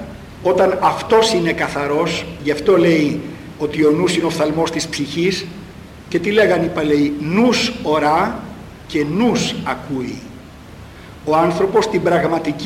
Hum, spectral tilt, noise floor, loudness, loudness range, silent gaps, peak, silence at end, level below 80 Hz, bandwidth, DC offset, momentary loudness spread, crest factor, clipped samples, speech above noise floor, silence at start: none; -5 dB/octave; -37 dBFS; -17 LUFS; 4 LU; none; -2 dBFS; 0 s; -44 dBFS; 16 kHz; under 0.1%; 16 LU; 14 dB; under 0.1%; 21 dB; 0 s